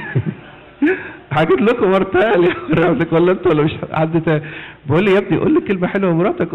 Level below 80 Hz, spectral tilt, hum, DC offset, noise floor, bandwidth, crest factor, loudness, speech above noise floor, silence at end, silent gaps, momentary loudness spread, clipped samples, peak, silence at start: -46 dBFS; -9 dB/octave; none; under 0.1%; -37 dBFS; 5.4 kHz; 8 dB; -16 LUFS; 22 dB; 0 s; none; 8 LU; under 0.1%; -8 dBFS; 0 s